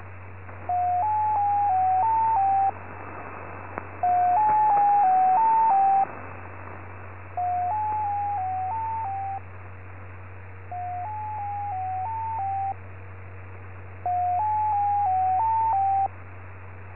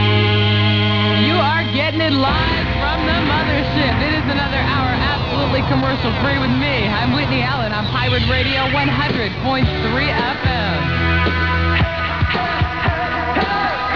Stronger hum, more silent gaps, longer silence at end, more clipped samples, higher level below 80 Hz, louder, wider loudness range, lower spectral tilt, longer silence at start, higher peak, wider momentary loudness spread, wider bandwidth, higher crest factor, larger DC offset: neither; neither; about the same, 0 s vs 0 s; neither; second, -50 dBFS vs -28 dBFS; second, -24 LUFS vs -17 LUFS; first, 11 LU vs 2 LU; first, -10 dB/octave vs -7 dB/octave; about the same, 0 s vs 0 s; second, -12 dBFS vs -2 dBFS; first, 22 LU vs 4 LU; second, 3 kHz vs 5.4 kHz; about the same, 14 dB vs 14 dB; about the same, 0.6% vs 0.7%